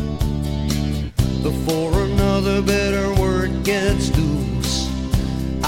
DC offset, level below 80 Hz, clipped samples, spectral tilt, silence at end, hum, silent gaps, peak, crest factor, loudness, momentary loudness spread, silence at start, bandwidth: under 0.1%; -26 dBFS; under 0.1%; -5.5 dB/octave; 0 s; none; none; -4 dBFS; 16 dB; -20 LUFS; 4 LU; 0 s; 17 kHz